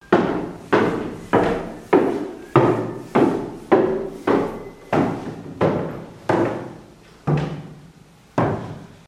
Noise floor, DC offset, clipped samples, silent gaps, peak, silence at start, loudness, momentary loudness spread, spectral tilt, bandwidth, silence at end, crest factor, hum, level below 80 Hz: -48 dBFS; under 0.1%; under 0.1%; none; 0 dBFS; 0.1 s; -21 LUFS; 12 LU; -7.5 dB/octave; 13.5 kHz; 0.1 s; 22 dB; none; -48 dBFS